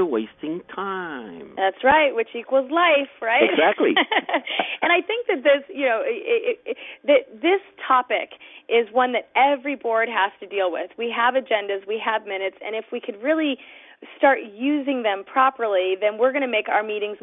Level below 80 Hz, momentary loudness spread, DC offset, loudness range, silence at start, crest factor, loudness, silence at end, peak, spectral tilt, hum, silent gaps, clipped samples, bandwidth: -66 dBFS; 11 LU; under 0.1%; 5 LU; 0 s; 20 dB; -21 LUFS; 0.05 s; -2 dBFS; -8 dB/octave; none; none; under 0.1%; 3.9 kHz